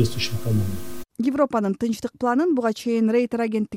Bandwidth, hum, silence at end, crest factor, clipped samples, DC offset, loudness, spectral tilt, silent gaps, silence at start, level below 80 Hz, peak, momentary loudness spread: 16.5 kHz; none; 0 s; 16 dB; under 0.1%; under 0.1%; -23 LUFS; -6.5 dB/octave; none; 0 s; -52 dBFS; -8 dBFS; 6 LU